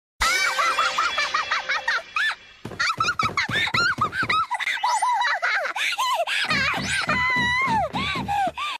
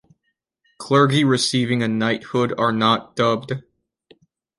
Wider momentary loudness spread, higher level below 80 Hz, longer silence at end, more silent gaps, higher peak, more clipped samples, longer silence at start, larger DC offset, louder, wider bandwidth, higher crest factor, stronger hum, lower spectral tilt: second, 4 LU vs 9 LU; first, -48 dBFS vs -60 dBFS; second, 0 s vs 1 s; neither; second, -8 dBFS vs -2 dBFS; neither; second, 0.2 s vs 0.8 s; neither; second, -22 LUFS vs -19 LUFS; first, 14.5 kHz vs 11.5 kHz; about the same, 16 dB vs 20 dB; neither; second, -2 dB/octave vs -5 dB/octave